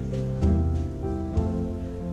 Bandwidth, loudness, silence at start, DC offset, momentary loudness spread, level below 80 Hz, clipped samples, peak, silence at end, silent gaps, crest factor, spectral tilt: 7.8 kHz; -27 LUFS; 0 s; under 0.1%; 7 LU; -34 dBFS; under 0.1%; -12 dBFS; 0 s; none; 14 dB; -9.5 dB/octave